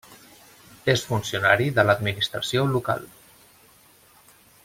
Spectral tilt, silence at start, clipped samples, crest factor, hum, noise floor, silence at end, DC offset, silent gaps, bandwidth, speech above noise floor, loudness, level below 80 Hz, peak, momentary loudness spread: -4.5 dB/octave; 0.1 s; under 0.1%; 22 dB; none; -55 dBFS; 1.6 s; under 0.1%; none; 16.5 kHz; 32 dB; -23 LUFS; -58 dBFS; -4 dBFS; 9 LU